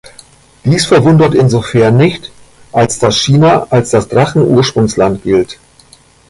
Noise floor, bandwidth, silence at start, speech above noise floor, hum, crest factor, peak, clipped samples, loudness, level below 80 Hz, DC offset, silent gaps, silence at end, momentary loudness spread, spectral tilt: -43 dBFS; 11.5 kHz; 0.65 s; 34 dB; none; 10 dB; 0 dBFS; under 0.1%; -10 LUFS; -40 dBFS; under 0.1%; none; 0.75 s; 6 LU; -6 dB/octave